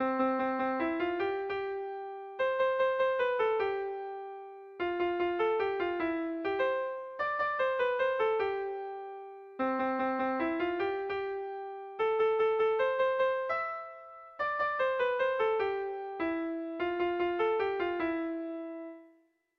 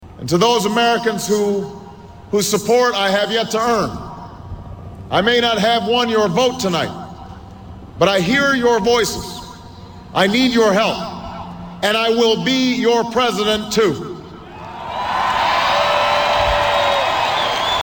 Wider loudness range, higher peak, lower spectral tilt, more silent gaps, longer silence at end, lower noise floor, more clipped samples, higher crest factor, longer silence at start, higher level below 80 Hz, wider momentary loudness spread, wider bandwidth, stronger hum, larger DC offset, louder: about the same, 2 LU vs 2 LU; second, -18 dBFS vs -2 dBFS; first, -6 dB/octave vs -4 dB/octave; neither; first, 0.5 s vs 0 s; first, -67 dBFS vs -37 dBFS; neither; about the same, 14 dB vs 16 dB; about the same, 0 s vs 0 s; second, -68 dBFS vs -42 dBFS; second, 12 LU vs 19 LU; second, 6.4 kHz vs 18 kHz; neither; neither; second, -32 LUFS vs -16 LUFS